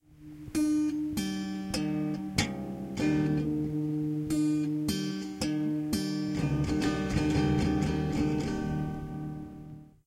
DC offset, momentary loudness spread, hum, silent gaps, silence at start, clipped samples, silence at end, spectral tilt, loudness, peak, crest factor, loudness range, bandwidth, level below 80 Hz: under 0.1%; 10 LU; none; none; 0.1 s; under 0.1%; 0.2 s; -6 dB/octave; -31 LUFS; -10 dBFS; 20 dB; 2 LU; 15 kHz; -46 dBFS